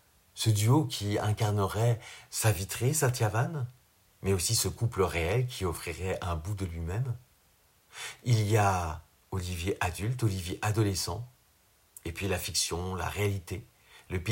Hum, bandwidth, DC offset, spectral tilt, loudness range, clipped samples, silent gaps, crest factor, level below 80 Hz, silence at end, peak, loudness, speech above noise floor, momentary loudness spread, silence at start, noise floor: none; 16.5 kHz; under 0.1%; -4.5 dB/octave; 4 LU; under 0.1%; none; 18 dB; -50 dBFS; 0 s; -12 dBFS; -30 LUFS; 36 dB; 13 LU; 0.35 s; -65 dBFS